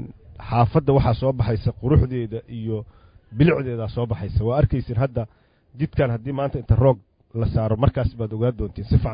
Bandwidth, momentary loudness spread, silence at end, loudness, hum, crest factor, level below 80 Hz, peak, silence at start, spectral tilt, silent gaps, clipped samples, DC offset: 5.2 kHz; 12 LU; 0 s; -22 LUFS; none; 18 dB; -32 dBFS; -4 dBFS; 0 s; -13 dB/octave; none; under 0.1%; under 0.1%